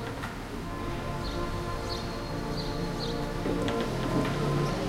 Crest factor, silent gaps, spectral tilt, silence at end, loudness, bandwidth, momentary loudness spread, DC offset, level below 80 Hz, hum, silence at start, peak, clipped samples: 16 dB; none; -6 dB/octave; 0 s; -32 LUFS; 16 kHz; 7 LU; under 0.1%; -40 dBFS; none; 0 s; -14 dBFS; under 0.1%